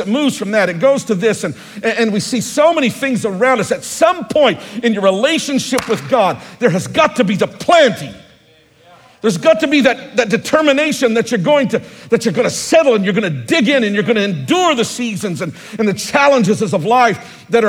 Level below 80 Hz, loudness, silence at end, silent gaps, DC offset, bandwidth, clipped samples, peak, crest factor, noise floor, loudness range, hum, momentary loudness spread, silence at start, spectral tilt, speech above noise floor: -56 dBFS; -14 LUFS; 0 s; none; under 0.1%; 17 kHz; under 0.1%; 0 dBFS; 14 dB; -49 dBFS; 1 LU; none; 7 LU; 0 s; -4.5 dB/octave; 35 dB